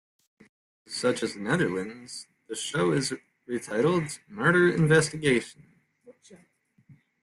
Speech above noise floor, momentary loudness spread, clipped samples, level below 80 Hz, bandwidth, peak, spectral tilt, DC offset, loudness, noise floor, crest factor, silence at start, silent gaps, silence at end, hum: 38 dB; 17 LU; under 0.1%; -64 dBFS; 12.5 kHz; -8 dBFS; -5 dB/octave; under 0.1%; -26 LUFS; -64 dBFS; 20 dB; 0.9 s; none; 0.3 s; none